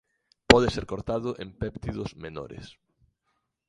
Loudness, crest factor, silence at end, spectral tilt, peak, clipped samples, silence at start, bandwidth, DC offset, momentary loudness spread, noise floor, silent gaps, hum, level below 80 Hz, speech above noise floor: -26 LUFS; 28 dB; 0.95 s; -5 dB/octave; 0 dBFS; under 0.1%; 0.5 s; 11.5 kHz; under 0.1%; 20 LU; -77 dBFS; none; none; -44 dBFS; 47 dB